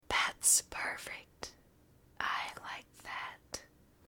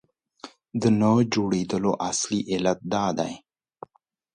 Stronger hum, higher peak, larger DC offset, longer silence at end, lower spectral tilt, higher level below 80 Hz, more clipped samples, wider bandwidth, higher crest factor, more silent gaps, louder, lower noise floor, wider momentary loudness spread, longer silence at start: neither; second, -14 dBFS vs -8 dBFS; neither; second, 0.4 s vs 0.95 s; second, 1 dB/octave vs -5 dB/octave; second, -64 dBFS vs -58 dBFS; neither; first, 19.5 kHz vs 9.8 kHz; first, 24 dB vs 18 dB; neither; second, -33 LUFS vs -24 LUFS; about the same, -65 dBFS vs -67 dBFS; about the same, 20 LU vs 21 LU; second, 0.1 s vs 0.45 s